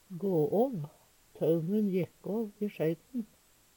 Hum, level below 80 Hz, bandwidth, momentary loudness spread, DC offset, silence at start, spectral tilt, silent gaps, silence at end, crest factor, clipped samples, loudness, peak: none; -72 dBFS; 18 kHz; 12 LU; under 0.1%; 0.1 s; -9 dB/octave; none; 0.5 s; 16 dB; under 0.1%; -32 LUFS; -18 dBFS